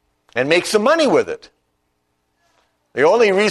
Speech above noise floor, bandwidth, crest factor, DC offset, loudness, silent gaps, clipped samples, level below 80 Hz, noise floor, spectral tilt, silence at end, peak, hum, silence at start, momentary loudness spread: 54 dB; 13.5 kHz; 16 dB; under 0.1%; -16 LUFS; none; under 0.1%; -62 dBFS; -69 dBFS; -4 dB/octave; 0 s; -2 dBFS; 60 Hz at -55 dBFS; 0.35 s; 14 LU